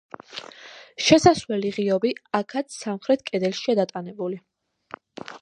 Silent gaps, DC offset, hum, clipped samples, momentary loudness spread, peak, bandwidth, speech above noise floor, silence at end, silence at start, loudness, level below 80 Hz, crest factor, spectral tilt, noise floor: none; under 0.1%; none; under 0.1%; 23 LU; -2 dBFS; 11 kHz; 23 dB; 0.05 s; 0.3 s; -23 LUFS; -58 dBFS; 22 dB; -4.5 dB/octave; -45 dBFS